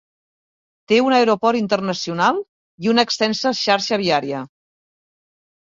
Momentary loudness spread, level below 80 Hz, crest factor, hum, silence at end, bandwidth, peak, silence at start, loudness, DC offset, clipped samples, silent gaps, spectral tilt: 12 LU; -64 dBFS; 18 dB; none; 1.3 s; 7.6 kHz; -2 dBFS; 0.9 s; -18 LUFS; under 0.1%; under 0.1%; 2.48-2.78 s; -4 dB/octave